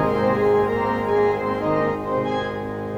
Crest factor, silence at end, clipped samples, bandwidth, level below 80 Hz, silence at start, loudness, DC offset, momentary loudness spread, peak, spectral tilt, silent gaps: 12 dB; 0 s; under 0.1%; 8.8 kHz; -46 dBFS; 0 s; -21 LUFS; under 0.1%; 6 LU; -8 dBFS; -7.5 dB/octave; none